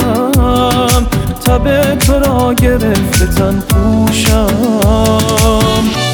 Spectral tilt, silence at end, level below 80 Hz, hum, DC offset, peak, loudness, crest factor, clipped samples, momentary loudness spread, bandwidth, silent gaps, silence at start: -5 dB/octave; 0 s; -18 dBFS; none; under 0.1%; 0 dBFS; -11 LUFS; 10 dB; under 0.1%; 2 LU; over 20 kHz; none; 0 s